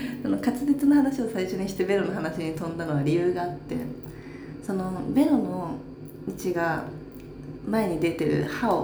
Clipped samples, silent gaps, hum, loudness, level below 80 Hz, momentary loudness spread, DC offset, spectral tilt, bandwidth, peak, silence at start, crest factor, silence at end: under 0.1%; none; none; -26 LUFS; -52 dBFS; 17 LU; under 0.1%; -7 dB/octave; over 20 kHz; -10 dBFS; 0 s; 16 dB; 0 s